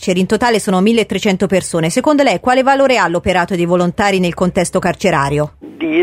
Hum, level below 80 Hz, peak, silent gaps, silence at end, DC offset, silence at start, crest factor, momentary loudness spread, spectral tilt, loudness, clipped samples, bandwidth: none; -40 dBFS; 0 dBFS; none; 0 s; under 0.1%; 0 s; 14 dB; 4 LU; -5 dB/octave; -14 LUFS; under 0.1%; 15 kHz